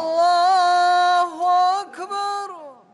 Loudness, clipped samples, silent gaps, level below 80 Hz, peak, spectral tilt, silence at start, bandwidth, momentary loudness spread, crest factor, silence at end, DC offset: -18 LUFS; under 0.1%; none; -74 dBFS; -10 dBFS; -1 dB/octave; 0 s; 11 kHz; 12 LU; 10 dB; 0.2 s; under 0.1%